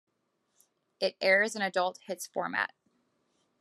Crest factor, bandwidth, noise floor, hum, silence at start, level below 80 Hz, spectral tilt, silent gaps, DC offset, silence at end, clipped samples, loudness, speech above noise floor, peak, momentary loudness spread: 20 dB; 13 kHz; -78 dBFS; none; 1 s; -88 dBFS; -2.5 dB/octave; none; under 0.1%; 0.95 s; under 0.1%; -30 LUFS; 47 dB; -12 dBFS; 11 LU